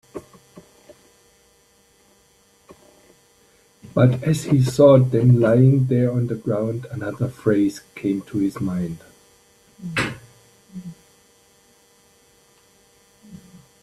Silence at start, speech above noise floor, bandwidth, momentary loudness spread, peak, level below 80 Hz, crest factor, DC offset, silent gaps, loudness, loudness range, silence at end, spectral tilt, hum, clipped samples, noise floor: 0.15 s; 40 dB; 13 kHz; 24 LU; -2 dBFS; -54 dBFS; 20 dB; under 0.1%; none; -19 LUFS; 16 LU; 0.45 s; -8 dB/octave; none; under 0.1%; -58 dBFS